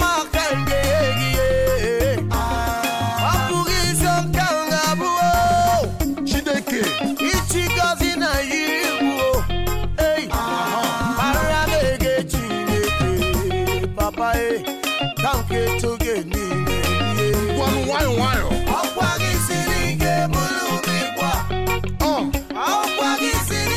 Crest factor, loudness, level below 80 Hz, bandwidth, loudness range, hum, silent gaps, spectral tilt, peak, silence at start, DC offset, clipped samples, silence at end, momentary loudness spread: 10 dB; -20 LUFS; -30 dBFS; 17.5 kHz; 2 LU; none; none; -4.5 dB/octave; -10 dBFS; 0 s; under 0.1%; under 0.1%; 0 s; 4 LU